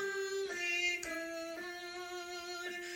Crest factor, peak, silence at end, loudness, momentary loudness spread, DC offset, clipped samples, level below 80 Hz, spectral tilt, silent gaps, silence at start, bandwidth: 16 dB; -24 dBFS; 0 s; -38 LUFS; 10 LU; under 0.1%; under 0.1%; -74 dBFS; -1 dB/octave; none; 0 s; 16.5 kHz